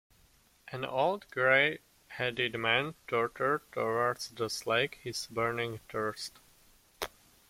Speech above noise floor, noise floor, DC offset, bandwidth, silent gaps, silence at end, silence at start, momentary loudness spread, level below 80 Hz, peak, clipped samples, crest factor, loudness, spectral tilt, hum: 33 dB; -65 dBFS; under 0.1%; 16.5 kHz; none; 0.4 s; 0.65 s; 15 LU; -66 dBFS; -12 dBFS; under 0.1%; 22 dB; -32 LUFS; -3.5 dB/octave; none